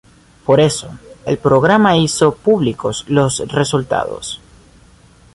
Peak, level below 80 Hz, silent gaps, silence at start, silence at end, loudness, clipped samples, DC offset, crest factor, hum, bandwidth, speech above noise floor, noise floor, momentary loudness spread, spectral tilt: 0 dBFS; -46 dBFS; none; 0.5 s; 1 s; -15 LUFS; under 0.1%; under 0.1%; 14 dB; none; 11.5 kHz; 32 dB; -46 dBFS; 15 LU; -5 dB/octave